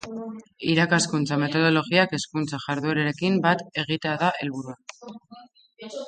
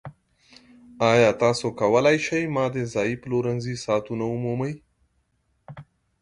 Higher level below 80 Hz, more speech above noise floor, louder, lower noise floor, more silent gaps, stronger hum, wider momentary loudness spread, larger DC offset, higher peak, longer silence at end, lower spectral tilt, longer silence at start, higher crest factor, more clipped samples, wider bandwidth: second, -66 dBFS vs -58 dBFS; second, 25 dB vs 47 dB; about the same, -23 LUFS vs -23 LUFS; second, -49 dBFS vs -70 dBFS; neither; neither; first, 18 LU vs 10 LU; neither; about the same, -6 dBFS vs -4 dBFS; second, 0 s vs 0.4 s; about the same, -5 dB/octave vs -5.5 dB/octave; about the same, 0.05 s vs 0.05 s; about the same, 20 dB vs 20 dB; neither; second, 9.6 kHz vs 11.5 kHz